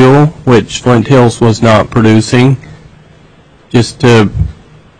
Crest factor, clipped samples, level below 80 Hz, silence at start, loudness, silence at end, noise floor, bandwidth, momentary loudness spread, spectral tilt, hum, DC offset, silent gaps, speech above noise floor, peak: 8 dB; 0.5%; -30 dBFS; 0 s; -8 LUFS; 0.5 s; -41 dBFS; 10.5 kHz; 7 LU; -6.5 dB/octave; none; under 0.1%; none; 34 dB; 0 dBFS